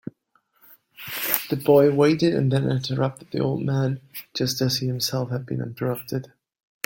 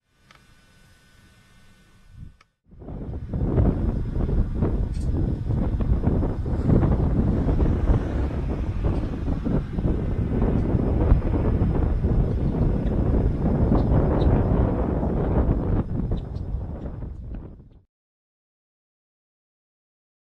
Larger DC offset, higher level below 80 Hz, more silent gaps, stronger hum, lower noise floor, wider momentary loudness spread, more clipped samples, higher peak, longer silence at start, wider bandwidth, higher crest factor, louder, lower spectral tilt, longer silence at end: neither; second, -60 dBFS vs -26 dBFS; neither; neither; first, -66 dBFS vs -55 dBFS; first, 14 LU vs 11 LU; neither; about the same, -2 dBFS vs -4 dBFS; second, 1 s vs 2.15 s; first, 17 kHz vs 5.4 kHz; about the same, 22 dB vs 20 dB; about the same, -23 LUFS vs -24 LUFS; second, -5.5 dB/octave vs -10.5 dB/octave; second, 0.6 s vs 2.75 s